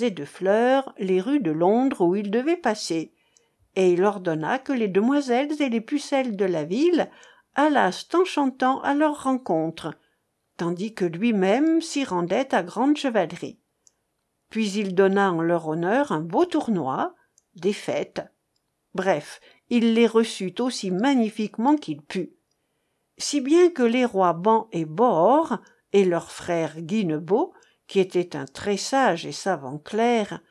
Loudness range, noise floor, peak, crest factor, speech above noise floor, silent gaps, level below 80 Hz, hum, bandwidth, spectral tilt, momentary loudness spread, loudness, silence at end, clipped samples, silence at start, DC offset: 3 LU; -75 dBFS; -6 dBFS; 18 dB; 52 dB; none; -72 dBFS; none; 12 kHz; -5.5 dB/octave; 10 LU; -23 LUFS; 0.1 s; under 0.1%; 0 s; under 0.1%